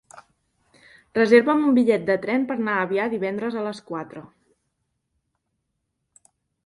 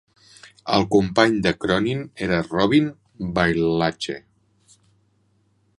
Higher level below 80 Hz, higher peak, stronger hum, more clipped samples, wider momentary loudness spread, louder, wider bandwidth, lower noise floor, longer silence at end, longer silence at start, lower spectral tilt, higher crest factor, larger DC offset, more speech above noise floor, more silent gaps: second, -68 dBFS vs -48 dBFS; second, -4 dBFS vs 0 dBFS; neither; neither; first, 17 LU vs 12 LU; about the same, -22 LUFS vs -21 LUFS; about the same, 11.5 kHz vs 11.5 kHz; first, -77 dBFS vs -64 dBFS; first, 2.4 s vs 1.6 s; second, 0.15 s vs 0.45 s; about the same, -6.5 dB/octave vs -6 dB/octave; about the same, 20 dB vs 22 dB; neither; first, 56 dB vs 44 dB; neither